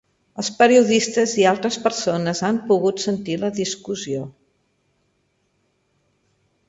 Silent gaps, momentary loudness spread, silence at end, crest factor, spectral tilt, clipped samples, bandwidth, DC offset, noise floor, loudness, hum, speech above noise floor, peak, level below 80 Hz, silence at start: none; 13 LU; 2.4 s; 18 dB; -4 dB/octave; under 0.1%; 8 kHz; under 0.1%; -68 dBFS; -20 LUFS; none; 48 dB; -2 dBFS; -64 dBFS; 0.35 s